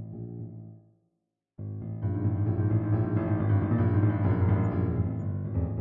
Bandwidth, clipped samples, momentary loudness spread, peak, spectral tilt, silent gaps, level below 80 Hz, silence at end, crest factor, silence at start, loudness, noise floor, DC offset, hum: 3.2 kHz; under 0.1%; 15 LU; -14 dBFS; -12.5 dB/octave; none; -50 dBFS; 0 s; 14 dB; 0 s; -28 LUFS; -81 dBFS; under 0.1%; none